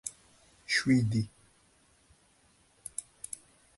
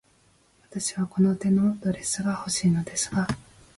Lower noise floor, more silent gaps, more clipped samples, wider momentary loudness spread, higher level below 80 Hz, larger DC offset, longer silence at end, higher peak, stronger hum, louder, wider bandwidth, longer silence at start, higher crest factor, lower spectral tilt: first, -66 dBFS vs -62 dBFS; neither; neither; first, 19 LU vs 8 LU; second, -62 dBFS vs -54 dBFS; neither; first, 0.75 s vs 0.35 s; about the same, -14 dBFS vs -12 dBFS; neither; second, -32 LUFS vs -26 LUFS; about the same, 12 kHz vs 11.5 kHz; second, 0.05 s vs 0.7 s; first, 20 dB vs 14 dB; about the same, -4.5 dB/octave vs -5 dB/octave